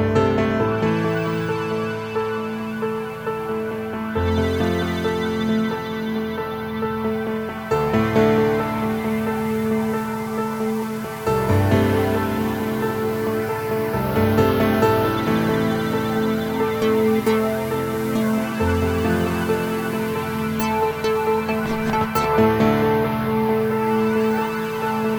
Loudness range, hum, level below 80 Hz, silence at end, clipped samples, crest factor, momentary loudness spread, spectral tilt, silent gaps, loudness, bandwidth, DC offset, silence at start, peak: 4 LU; none; -42 dBFS; 0 s; under 0.1%; 16 dB; 8 LU; -6.5 dB/octave; none; -21 LUFS; over 20 kHz; under 0.1%; 0 s; -4 dBFS